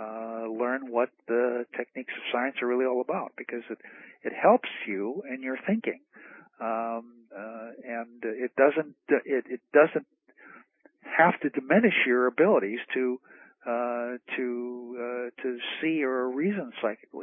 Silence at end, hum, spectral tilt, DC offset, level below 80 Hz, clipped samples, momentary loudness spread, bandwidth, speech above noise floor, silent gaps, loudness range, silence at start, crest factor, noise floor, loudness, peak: 0 s; none; -9.5 dB/octave; under 0.1%; -82 dBFS; under 0.1%; 15 LU; 3.8 kHz; 30 dB; none; 7 LU; 0 s; 22 dB; -57 dBFS; -28 LUFS; -6 dBFS